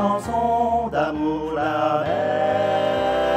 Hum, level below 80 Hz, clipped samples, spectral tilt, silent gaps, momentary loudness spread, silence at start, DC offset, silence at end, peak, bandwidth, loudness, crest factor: none; -46 dBFS; under 0.1%; -6 dB/octave; none; 3 LU; 0 s; under 0.1%; 0 s; -8 dBFS; 14 kHz; -21 LUFS; 12 dB